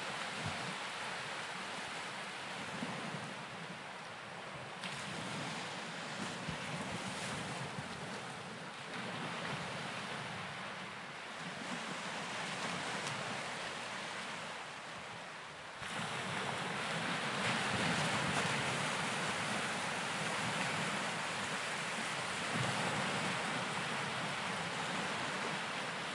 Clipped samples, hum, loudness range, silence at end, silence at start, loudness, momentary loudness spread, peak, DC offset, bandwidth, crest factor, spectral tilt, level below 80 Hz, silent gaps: under 0.1%; none; 7 LU; 0 s; 0 s; -39 LUFS; 10 LU; -22 dBFS; under 0.1%; 11.5 kHz; 20 dB; -3 dB/octave; -74 dBFS; none